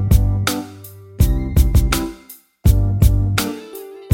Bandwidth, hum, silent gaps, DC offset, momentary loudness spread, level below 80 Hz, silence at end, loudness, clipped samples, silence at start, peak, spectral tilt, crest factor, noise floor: 17 kHz; none; none; under 0.1%; 19 LU; -20 dBFS; 0 s; -18 LUFS; under 0.1%; 0 s; 0 dBFS; -5.5 dB/octave; 16 dB; -43 dBFS